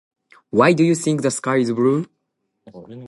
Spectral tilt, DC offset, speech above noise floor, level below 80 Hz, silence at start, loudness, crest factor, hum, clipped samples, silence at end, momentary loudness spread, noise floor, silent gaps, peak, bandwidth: -5.5 dB/octave; under 0.1%; 56 dB; -64 dBFS; 0.55 s; -18 LUFS; 20 dB; none; under 0.1%; 0 s; 11 LU; -74 dBFS; none; 0 dBFS; 11.5 kHz